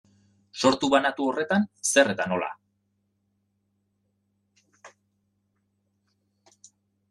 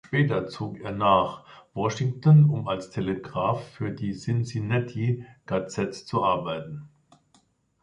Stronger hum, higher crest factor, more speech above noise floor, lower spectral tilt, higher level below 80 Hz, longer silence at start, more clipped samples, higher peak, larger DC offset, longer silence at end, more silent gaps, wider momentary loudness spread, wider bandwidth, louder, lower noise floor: neither; about the same, 24 dB vs 20 dB; first, 51 dB vs 40 dB; second, -3.5 dB/octave vs -7.5 dB/octave; second, -72 dBFS vs -56 dBFS; first, 0.55 s vs 0.05 s; neither; about the same, -6 dBFS vs -6 dBFS; neither; first, 2.25 s vs 0.95 s; neither; second, 9 LU vs 14 LU; first, 12.5 kHz vs 9.2 kHz; about the same, -24 LUFS vs -26 LUFS; first, -74 dBFS vs -65 dBFS